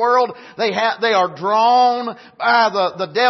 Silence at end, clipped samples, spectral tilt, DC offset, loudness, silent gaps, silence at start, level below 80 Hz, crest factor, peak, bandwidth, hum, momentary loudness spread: 0 s; under 0.1%; -4 dB/octave; under 0.1%; -17 LUFS; none; 0 s; -70 dBFS; 14 dB; -2 dBFS; 6.2 kHz; none; 9 LU